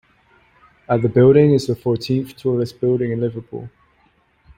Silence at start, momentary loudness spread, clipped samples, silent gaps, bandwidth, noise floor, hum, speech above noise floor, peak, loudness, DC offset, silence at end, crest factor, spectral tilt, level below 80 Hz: 0.9 s; 14 LU; under 0.1%; none; 15.5 kHz; -59 dBFS; none; 42 dB; -2 dBFS; -17 LUFS; under 0.1%; 0.9 s; 18 dB; -8 dB/octave; -52 dBFS